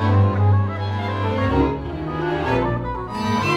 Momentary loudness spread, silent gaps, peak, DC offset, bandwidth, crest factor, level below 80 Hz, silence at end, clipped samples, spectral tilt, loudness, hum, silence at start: 8 LU; none; -6 dBFS; under 0.1%; 7 kHz; 14 dB; -36 dBFS; 0 s; under 0.1%; -7.5 dB/octave; -21 LUFS; none; 0 s